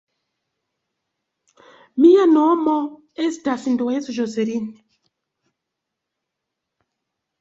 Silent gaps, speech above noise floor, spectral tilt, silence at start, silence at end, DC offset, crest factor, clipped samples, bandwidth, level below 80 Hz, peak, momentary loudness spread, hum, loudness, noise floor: none; 64 dB; -5.5 dB/octave; 1.95 s; 2.7 s; under 0.1%; 20 dB; under 0.1%; 7.8 kHz; -68 dBFS; -2 dBFS; 15 LU; none; -18 LUFS; -81 dBFS